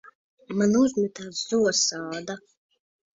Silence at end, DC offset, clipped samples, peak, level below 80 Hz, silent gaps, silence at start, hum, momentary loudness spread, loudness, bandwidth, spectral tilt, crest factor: 0.75 s; under 0.1%; under 0.1%; -10 dBFS; -66 dBFS; 0.15-0.37 s; 0.05 s; none; 13 LU; -24 LUFS; 7.8 kHz; -3.5 dB/octave; 16 dB